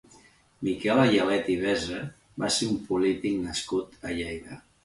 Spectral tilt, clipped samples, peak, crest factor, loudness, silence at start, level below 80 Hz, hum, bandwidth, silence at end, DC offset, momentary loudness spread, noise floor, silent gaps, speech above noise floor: -4.5 dB/octave; under 0.1%; -10 dBFS; 18 dB; -27 LUFS; 0.6 s; -54 dBFS; none; 11.5 kHz; 0.25 s; under 0.1%; 14 LU; -57 dBFS; none; 30 dB